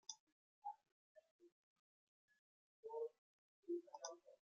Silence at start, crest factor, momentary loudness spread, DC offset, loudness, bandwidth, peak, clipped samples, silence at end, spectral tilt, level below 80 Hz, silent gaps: 0.1 s; 24 dB; 12 LU; under 0.1%; -54 LUFS; 7.4 kHz; -32 dBFS; under 0.1%; 0.1 s; -0.5 dB/octave; under -90 dBFS; 0.20-0.62 s, 0.92-1.15 s, 1.31-1.39 s, 1.52-2.28 s, 2.39-2.83 s, 3.18-3.63 s